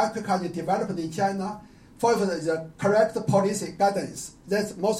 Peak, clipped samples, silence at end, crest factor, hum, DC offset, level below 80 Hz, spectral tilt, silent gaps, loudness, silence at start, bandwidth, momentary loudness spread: -10 dBFS; under 0.1%; 0 s; 16 dB; none; under 0.1%; -60 dBFS; -5.5 dB/octave; none; -26 LUFS; 0 s; 16 kHz; 9 LU